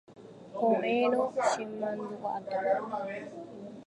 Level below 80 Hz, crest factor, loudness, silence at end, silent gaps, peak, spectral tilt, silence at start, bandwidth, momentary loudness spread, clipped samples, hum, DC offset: -78 dBFS; 18 dB; -31 LUFS; 0.05 s; none; -14 dBFS; -5 dB/octave; 0.1 s; 11 kHz; 17 LU; under 0.1%; none; under 0.1%